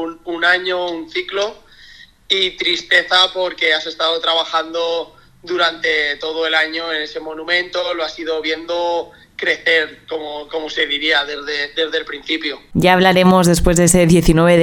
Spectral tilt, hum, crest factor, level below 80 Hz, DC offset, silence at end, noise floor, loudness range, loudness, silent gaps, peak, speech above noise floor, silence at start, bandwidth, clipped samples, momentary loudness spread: -4 dB/octave; none; 16 dB; -34 dBFS; under 0.1%; 0 s; -43 dBFS; 5 LU; -16 LUFS; none; 0 dBFS; 27 dB; 0 s; 16.5 kHz; under 0.1%; 12 LU